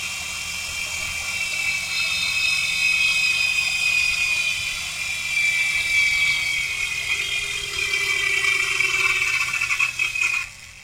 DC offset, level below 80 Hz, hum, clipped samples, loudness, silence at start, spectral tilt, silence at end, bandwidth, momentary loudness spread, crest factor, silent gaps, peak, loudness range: under 0.1%; -50 dBFS; none; under 0.1%; -20 LUFS; 0 s; 1 dB/octave; 0 s; 16.5 kHz; 8 LU; 16 dB; none; -6 dBFS; 1 LU